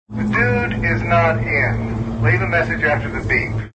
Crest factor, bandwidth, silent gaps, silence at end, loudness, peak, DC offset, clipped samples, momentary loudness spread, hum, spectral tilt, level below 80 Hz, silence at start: 16 dB; 8 kHz; none; 0.05 s; -18 LUFS; -2 dBFS; under 0.1%; under 0.1%; 4 LU; none; -8 dB/octave; -32 dBFS; 0.1 s